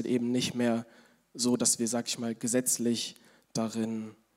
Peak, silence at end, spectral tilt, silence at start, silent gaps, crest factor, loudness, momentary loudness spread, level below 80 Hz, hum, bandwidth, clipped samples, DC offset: -12 dBFS; 0.25 s; -3.5 dB/octave; 0 s; none; 18 dB; -30 LUFS; 10 LU; -76 dBFS; none; 16 kHz; under 0.1%; under 0.1%